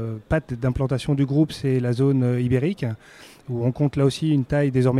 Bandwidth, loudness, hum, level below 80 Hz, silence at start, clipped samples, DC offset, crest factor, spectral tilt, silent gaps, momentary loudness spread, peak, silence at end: 12 kHz; -22 LUFS; none; -44 dBFS; 0 s; under 0.1%; under 0.1%; 14 dB; -8 dB/octave; none; 8 LU; -8 dBFS; 0 s